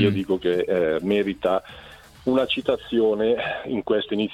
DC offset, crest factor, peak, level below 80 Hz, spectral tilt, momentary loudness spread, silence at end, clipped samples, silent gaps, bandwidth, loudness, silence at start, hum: under 0.1%; 18 dB; -6 dBFS; -54 dBFS; -7 dB/octave; 6 LU; 0 s; under 0.1%; none; 13.5 kHz; -23 LUFS; 0 s; none